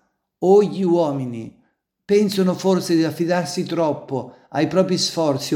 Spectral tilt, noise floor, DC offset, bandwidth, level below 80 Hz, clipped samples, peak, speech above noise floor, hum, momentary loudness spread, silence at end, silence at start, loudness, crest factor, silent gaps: -5.5 dB/octave; -64 dBFS; under 0.1%; 17 kHz; -66 dBFS; under 0.1%; -4 dBFS; 45 dB; none; 13 LU; 0 s; 0.4 s; -20 LUFS; 16 dB; none